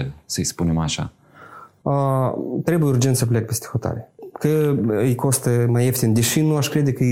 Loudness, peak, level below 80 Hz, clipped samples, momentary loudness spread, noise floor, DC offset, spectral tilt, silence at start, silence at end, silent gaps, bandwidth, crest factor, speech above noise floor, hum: -20 LUFS; -6 dBFS; -46 dBFS; under 0.1%; 9 LU; -43 dBFS; under 0.1%; -5.5 dB/octave; 0 s; 0 s; none; 16.5 kHz; 14 dB; 24 dB; none